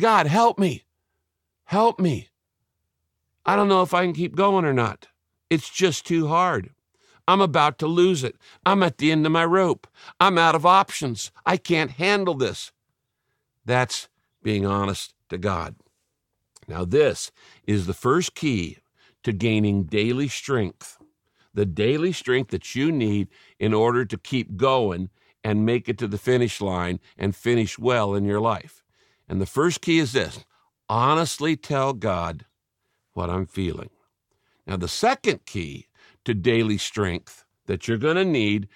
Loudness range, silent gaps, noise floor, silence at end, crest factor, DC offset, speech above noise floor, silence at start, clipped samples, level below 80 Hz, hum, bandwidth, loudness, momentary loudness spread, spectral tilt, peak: 7 LU; none; -79 dBFS; 0.1 s; 20 dB; under 0.1%; 57 dB; 0 s; under 0.1%; -54 dBFS; none; 16 kHz; -23 LUFS; 13 LU; -5.5 dB/octave; -2 dBFS